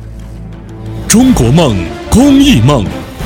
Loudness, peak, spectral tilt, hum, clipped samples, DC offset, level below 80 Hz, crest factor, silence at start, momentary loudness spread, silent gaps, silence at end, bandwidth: -8 LUFS; 0 dBFS; -5.5 dB/octave; none; 3%; under 0.1%; -22 dBFS; 10 dB; 0 s; 22 LU; none; 0 s; over 20 kHz